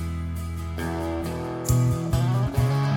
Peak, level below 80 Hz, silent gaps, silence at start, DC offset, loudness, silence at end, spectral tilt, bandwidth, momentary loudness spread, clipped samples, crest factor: -10 dBFS; -38 dBFS; none; 0 s; under 0.1%; -26 LUFS; 0 s; -6.5 dB/octave; 17 kHz; 9 LU; under 0.1%; 14 dB